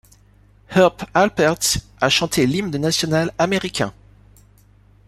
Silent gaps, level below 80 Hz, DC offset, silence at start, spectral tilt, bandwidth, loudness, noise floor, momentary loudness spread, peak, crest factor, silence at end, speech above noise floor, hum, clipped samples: none; -46 dBFS; under 0.1%; 0.7 s; -4 dB/octave; 15.5 kHz; -19 LUFS; -52 dBFS; 5 LU; -2 dBFS; 18 dB; 1.15 s; 33 dB; 50 Hz at -45 dBFS; under 0.1%